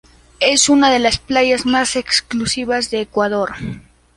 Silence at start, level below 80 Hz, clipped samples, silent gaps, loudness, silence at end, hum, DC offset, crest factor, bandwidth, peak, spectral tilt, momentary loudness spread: 0.4 s; -42 dBFS; under 0.1%; none; -15 LUFS; 0.35 s; none; under 0.1%; 16 dB; 11.5 kHz; -2 dBFS; -2.5 dB/octave; 11 LU